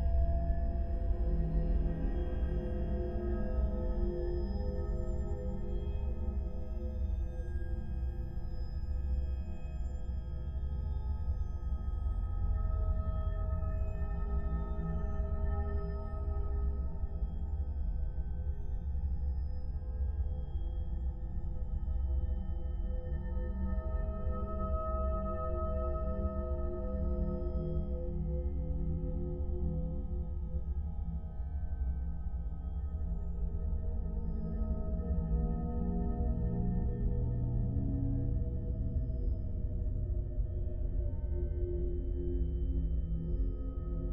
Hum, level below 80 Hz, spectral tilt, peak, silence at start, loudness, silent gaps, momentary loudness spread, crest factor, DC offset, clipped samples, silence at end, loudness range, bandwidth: none; -36 dBFS; -11 dB/octave; -20 dBFS; 0 s; -38 LUFS; none; 5 LU; 14 dB; under 0.1%; under 0.1%; 0 s; 4 LU; 5.4 kHz